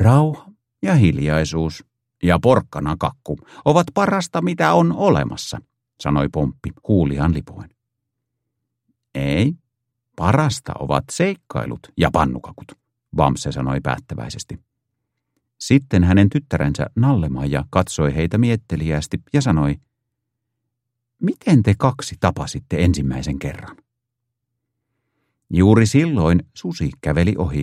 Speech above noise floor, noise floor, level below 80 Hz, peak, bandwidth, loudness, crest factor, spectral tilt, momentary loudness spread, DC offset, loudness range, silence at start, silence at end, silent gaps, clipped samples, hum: 61 dB; -79 dBFS; -36 dBFS; 0 dBFS; 13 kHz; -19 LUFS; 20 dB; -7 dB/octave; 14 LU; under 0.1%; 5 LU; 0 s; 0 s; none; under 0.1%; none